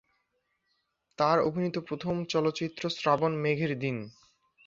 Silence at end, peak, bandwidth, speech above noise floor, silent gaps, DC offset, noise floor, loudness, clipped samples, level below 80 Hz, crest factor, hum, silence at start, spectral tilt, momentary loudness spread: 0.55 s; -10 dBFS; 7.6 kHz; 49 dB; none; under 0.1%; -78 dBFS; -29 LUFS; under 0.1%; -68 dBFS; 20 dB; none; 1.2 s; -6 dB/octave; 8 LU